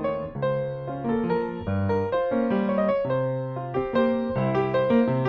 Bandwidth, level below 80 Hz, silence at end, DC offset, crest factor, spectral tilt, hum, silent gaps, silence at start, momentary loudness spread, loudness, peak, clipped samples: 5.6 kHz; -52 dBFS; 0 s; under 0.1%; 14 dB; -10 dB/octave; none; none; 0 s; 6 LU; -25 LUFS; -10 dBFS; under 0.1%